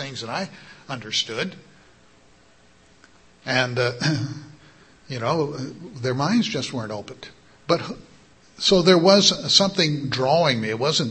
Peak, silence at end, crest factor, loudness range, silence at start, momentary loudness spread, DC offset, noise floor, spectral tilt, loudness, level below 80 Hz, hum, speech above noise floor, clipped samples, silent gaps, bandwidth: 0 dBFS; 0 s; 22 dB; 10 LU; 0 s; 20 LU; under 0.1%; -55 dBFS; -4 dB/octave; -21 LUFS; -58 dBFS; none; 33 dB; under 0.1%; none; 8.8 kHz